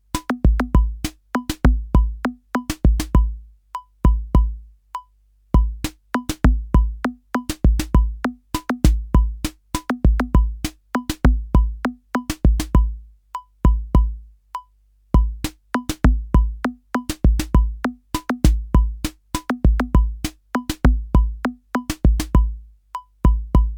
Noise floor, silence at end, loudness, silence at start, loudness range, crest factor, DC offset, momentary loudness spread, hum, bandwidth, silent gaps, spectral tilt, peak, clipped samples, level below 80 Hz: -57 dBFS; 0 s; -21 LUFS; 0.15 s; 2 LU; 18 dB; under 0.1%; 13 LU; 50 Hz at -35 dBFS; 17 kHz; none; -6.5 dB/octave; 0 dBFS; under 0.1%; -20 dBFS